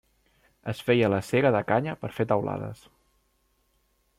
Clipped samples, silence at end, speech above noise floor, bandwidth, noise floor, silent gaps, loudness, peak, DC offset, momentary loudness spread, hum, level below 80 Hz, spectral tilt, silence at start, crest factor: under 0.1%; 1.45 s; 44 dB; 16 kHz; -70 dBFS; none; -26 LUFS; -8 dBFS; under 0.1%; 13 LU; none; -62 dBFS; -7 dB/octave; 0.65 s; 20 dB